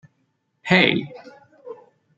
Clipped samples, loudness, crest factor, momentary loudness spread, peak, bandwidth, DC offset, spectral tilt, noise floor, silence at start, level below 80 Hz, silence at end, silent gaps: under 0.1%; -18 LUFS; 24 dB; 25 LU; -2 dBFS; 7.8 kHz; under 0.1%; -6 dB/octave; -70 dBFS; 0.65 s; -62 dBFS; 0.45 s; none